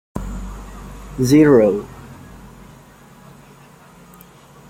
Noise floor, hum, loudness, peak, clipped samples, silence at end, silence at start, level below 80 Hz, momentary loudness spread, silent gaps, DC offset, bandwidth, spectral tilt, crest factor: -45 dBFS; none; -15 LUFS; -2 dBFS; under 0.1%; 2.55 s; 0.15 s; -38 dBFS; 28 LU; none; under 0.1%; 16 kHz; -7 dB/octave; 18 dB